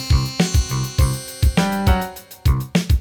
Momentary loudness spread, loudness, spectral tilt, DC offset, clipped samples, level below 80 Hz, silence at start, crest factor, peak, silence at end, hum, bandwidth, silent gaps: 4 LU; -20 LUFS; -5.5 dB/octave; under 0.1%; under 0.1%; -22 dBFS; 0 s; 16 dB; -2 dBFS; 0 s; none; 19.5 kHz; none